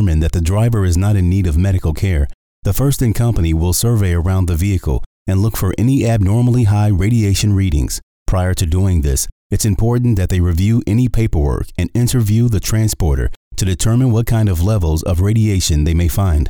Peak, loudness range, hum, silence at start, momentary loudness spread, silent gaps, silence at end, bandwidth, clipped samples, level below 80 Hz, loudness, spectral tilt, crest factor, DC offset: -6 dBFS; 1 LU; none; 0 s; 6 LU; 2.34-2.62 s, 5.06-5.26 s, 8.03-8.26 s, 9.32-9.50 s, 13.36-13.51 s; 0 s; over 20 kHz; under 0.1%; -22 dBFS; -15 LUFS; -6 dB/octave; 8 dB; 0.3%